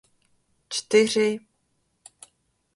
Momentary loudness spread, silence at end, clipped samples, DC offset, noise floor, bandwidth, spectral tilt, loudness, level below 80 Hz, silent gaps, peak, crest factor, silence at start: 12 LU; 1.35 s; under 0.1%; under 0.1%; -72 dBFS; 11.5 kHz; -3 dB/octave; -23 LUFS; -70 dBFS; none; -4 dBFS; 22 dB; 0.7 s